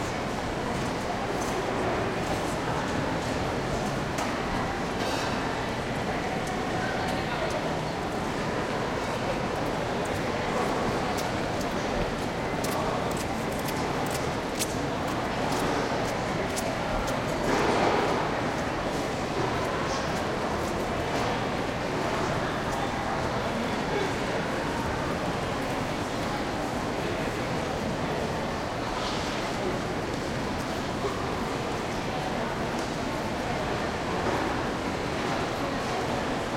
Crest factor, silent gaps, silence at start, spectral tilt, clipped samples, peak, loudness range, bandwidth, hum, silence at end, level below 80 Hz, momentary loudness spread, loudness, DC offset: 16 dB; none; 0 s; -5 dB/octave; under 0.1%; -12 dBFS; 3 LU; 16.5 kHz; none; 0 s; -44 dBFS; 3 LU; -29 LUFS; under 0.1%